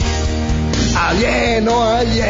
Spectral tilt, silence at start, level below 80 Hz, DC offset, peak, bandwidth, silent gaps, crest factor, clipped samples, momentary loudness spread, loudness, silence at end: -5 dB/octave; 0 s; -22 dBFS; under 0.1%; -4 dBFS; 7.8 kHz; none; 12 dB; under 0.1%; 4 LU; -15 LUFS; 0 s